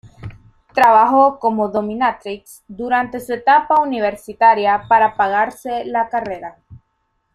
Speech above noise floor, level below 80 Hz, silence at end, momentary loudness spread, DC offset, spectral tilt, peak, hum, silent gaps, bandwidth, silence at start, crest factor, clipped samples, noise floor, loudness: 52 dB; -52 dBFS; 0.55 s; 18 LU; under 0.1%; -5.5 dB/octave; -2 dBFS; none; none; 13.5 kHz; 0.05 s; 16 dB; under 0.1%; -68 dBFS; -16 LUFS